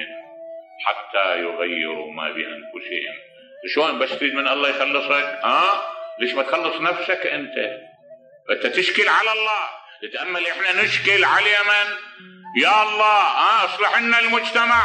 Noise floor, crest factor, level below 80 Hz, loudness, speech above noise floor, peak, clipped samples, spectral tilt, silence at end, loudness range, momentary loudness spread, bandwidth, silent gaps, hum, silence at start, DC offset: -47 dBFS; 16 dB; -68 dBFS; -19 LUFS; 27 dB; -4 dBFS; under 0.1%; -2.5 dB/octave; 0 s; 7 LU; 16 LU; 10.5 kHz; none; none; 0 s; under 0.1%